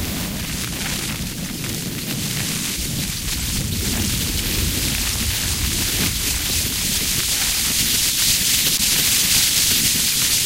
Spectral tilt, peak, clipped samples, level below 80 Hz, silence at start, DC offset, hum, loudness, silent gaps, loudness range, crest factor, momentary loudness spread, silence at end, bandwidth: -1.5 dB/octave; -4 dBFS; under 0.1%; -32 dBFS; 0 s; under 0.1%; none; -18 LUFS; none; 8 LU; 16 dB; 10 LU; 0 s; 16 kHz